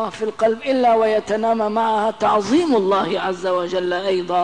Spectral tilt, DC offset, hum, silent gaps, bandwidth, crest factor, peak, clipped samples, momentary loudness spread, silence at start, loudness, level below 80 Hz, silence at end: -5 dB/octave; 0.3%; none; none; 10.5 kHz; 12 dB; -6 dBFS; under 0.1%; 5 LU; 0 s; -19 LUFS; -58 dBFS; 0 s